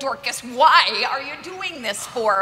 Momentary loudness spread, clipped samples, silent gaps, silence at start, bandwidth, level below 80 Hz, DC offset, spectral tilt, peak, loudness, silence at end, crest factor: 15 LU; under 0.1%; none; 0 s; 16 kHz; -62 dBFS; under 0.1%; -1 dB/octave; -2 dBFS; -19 LUFS; 0 s; 20 dB